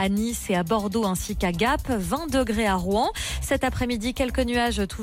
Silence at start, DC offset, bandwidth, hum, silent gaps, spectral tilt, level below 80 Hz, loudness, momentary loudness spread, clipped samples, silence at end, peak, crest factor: 0 s; under 0.1%; 17 kHz; none; none; -4.5 dB/octave; -36 dBFS; -25 LUFS; 3 LU; under 0.1%; 0 s; -12 dBFS; 12 dB